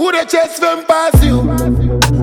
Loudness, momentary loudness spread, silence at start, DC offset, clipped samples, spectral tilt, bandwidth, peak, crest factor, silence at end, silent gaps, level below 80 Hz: -12 LUFS; 4 LU; 0 s; under 0.1%; under 0.1%; -5.5 dB/octave; 17.5 kHz; 0 dBFS; 12 dB; 0 s; none; -18 dBFS